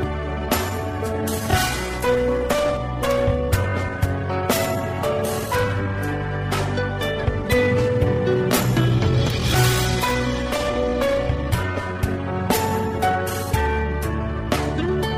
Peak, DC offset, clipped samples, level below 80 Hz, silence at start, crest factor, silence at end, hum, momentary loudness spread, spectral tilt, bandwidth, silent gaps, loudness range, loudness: -6 dBFS; under 0.1%; under 0.1%; -32 dBFS; 0 s; 14 dB; 0 s; none; 6 LU; -5.5 dB/octave; 16 kHz; none; 3 LU; -22 LUFS